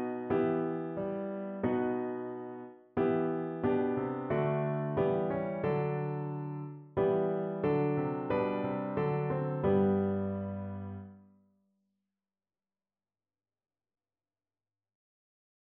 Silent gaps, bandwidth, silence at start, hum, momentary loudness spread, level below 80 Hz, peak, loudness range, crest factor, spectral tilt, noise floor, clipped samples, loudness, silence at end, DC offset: none; 4.3 kHz; 0 s; none; 10 LU; -66 dBFS; -16 dBFS; 4 LU; 16 dB; -8 dB/octave; under -90 dBFS; under 0.1%; -33 LUFS; 4.45 s; under 0.1%